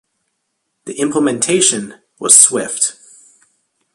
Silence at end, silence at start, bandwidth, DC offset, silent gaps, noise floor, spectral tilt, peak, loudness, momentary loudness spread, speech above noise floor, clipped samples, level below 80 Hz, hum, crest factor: 1.05 s; 0.85 s; 16 kHz; under 0.1%; none; -71 dBFS; -2 dB/octave; 0 dBFS; -12 LUFS; 17 LU; 57 dB; 0.2%; -64 dBFS; none; 16 dB